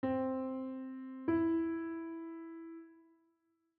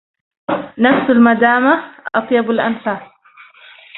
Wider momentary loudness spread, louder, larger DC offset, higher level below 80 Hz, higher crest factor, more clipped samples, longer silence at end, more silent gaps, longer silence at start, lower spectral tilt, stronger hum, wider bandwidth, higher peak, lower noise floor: first, 16 LU vs 12 LU; second, -38 LUFS vs -14 LUFS; neither; second, -74 dBFS vs -58 dBFS; about the same, 16 dB vs 16 dB; neither; first, 0.75 s vs 0 s; neither; second, 0.05 s vs 0.5 s; second, -7 dB/octave vs -9.5 dB/octave; neither; about the same, 4.3 kHz vs 4.1 kHz; second, -24 dBFS vs 0 dBFS; first, -79 dBFS vs -45 dBFS